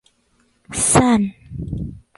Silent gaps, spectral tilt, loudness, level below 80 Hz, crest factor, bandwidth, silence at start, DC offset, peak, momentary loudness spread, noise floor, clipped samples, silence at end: none; -4.5 dB/octave; -18 LUFS; -38 dBFS; 20 dB; 11.5 kHz; 0.7 s; under 0.1%; 0 dBFS; 16 LU; -62 dBFS; under 0.1%; 0.2 s